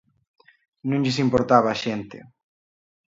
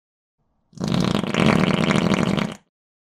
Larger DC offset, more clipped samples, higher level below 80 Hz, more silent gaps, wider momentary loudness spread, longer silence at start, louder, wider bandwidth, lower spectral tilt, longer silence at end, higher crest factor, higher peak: neither; neither; second, -54 dBFS vs -46 dBFS; neither; first, 15 LU vs 12 LU; about the same, 0.85 s vs 0.75 s; about the same, -22 LUFS vs -20 LUFS; second, 7.8 kHz vs 13.5 kHz; about the same, -6 dB/octave vs -6 dB/octave; first, 0.9 s vs 0.5 s; about the same, 22 dB vs 20 dB; about the same, -2 dBFS vs -2 dBFS